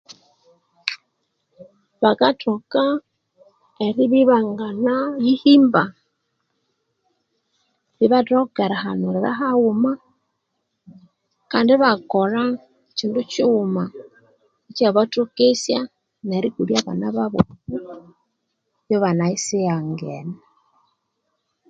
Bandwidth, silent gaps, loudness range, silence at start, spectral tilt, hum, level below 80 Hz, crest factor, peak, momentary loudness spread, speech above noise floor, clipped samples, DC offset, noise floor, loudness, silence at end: 9.2 kHz; none; 6 LU; 0.1 s; -5.5 dB/octave; none; -58 dBFS; 20 dB; 0 dBFS; 15 LU; 56 dB; under 0.1%; under 0.1%; -75 dBFS; -19 LUFS; 1.35 s